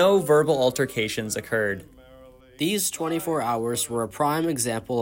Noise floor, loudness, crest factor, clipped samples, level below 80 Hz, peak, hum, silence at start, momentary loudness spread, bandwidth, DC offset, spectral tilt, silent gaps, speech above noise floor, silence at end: -49 dBFS; -24 LUFS; 16 dB; under 0.1%; -58 dBFS; -8 dBFS; none; 0 s; 8 LU; 16.5 kHz; under 0.1%; -4 dB/octave; none; 26 dB; 0 s